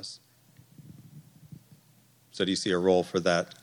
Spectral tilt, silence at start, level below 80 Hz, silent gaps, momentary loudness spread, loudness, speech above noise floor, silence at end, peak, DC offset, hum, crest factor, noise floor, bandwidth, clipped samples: -4.5 dB/octave; 0 s; -70 dBFS; none; 25 LU; -27 LUFS; 35 dB; 0.15 s; -10 dBFS; under 0.1%; none; 22 dB; -62 dBFS; 19.5 kHz; under 0.1%